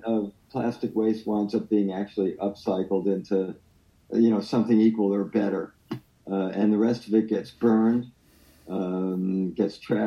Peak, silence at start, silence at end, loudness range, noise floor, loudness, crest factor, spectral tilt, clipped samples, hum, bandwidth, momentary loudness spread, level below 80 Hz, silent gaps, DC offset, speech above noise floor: -10 dBFS; 0 s; 0 s; 2 LU; -57 dBFS; -26 LUFS; 16 dB; -8.5 dB/octave; under 0.1%; none; 7 kHz; 10 LU; -64 dBFS; none; under 0.1%; 33 dB